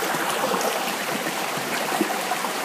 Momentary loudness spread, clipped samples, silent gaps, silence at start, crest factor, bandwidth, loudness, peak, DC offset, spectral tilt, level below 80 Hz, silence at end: 2 LU; under 0.1%; none; 0 s; 16 dB; 15.5 kHz; -24 LUFS; -8 dBFS; under 0.1%; -2 dB/octave; -74 dBFS; 0 s